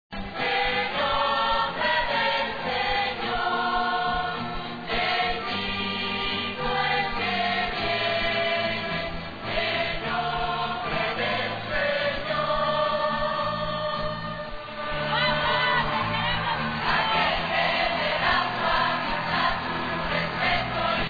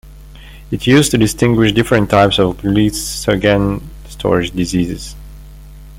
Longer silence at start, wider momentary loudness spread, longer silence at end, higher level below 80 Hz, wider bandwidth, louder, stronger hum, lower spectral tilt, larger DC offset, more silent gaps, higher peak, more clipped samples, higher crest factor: about the same, 0.1 s vs 0.05 s; second, 6 LU vs 12 LU; about the same, 0 s vs 0 s; second, -44 dBFS vs -32 dBFS; second, 5 kHz vs 16.5 kHz; second, -25 LUFS vs -14 LUFS; neither; about the same, -5.5 dB/octave vs -5 dB/octave; first, 0.4% vs under 0.1%; neither; second, -8 dBFS vs 0 dBFS; neither; about the same, 18 dB vs 14 dB